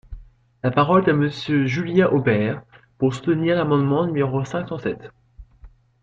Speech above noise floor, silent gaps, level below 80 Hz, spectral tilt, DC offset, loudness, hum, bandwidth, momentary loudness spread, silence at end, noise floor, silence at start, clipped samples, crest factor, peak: 28 dB; none; -48 dBFS; -8 dB/octave; under 0.1%; -20 LUFS; none; 7.8 kHz; 10 LU; 0.35 s; -48 dBFS; 0.1 s; under 0.1%; 18 dB; -4 dBFS